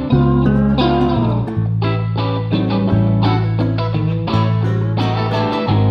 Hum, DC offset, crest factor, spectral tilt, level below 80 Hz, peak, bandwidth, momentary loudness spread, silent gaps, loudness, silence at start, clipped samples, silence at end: none; under 0.1%; 12 dB; -9 dB/octave; -32 dBFS; -2 dBFS; 5.8 kHz; 4 LU; none; -16 LUFS; 0 s; under 0.1%; 0 s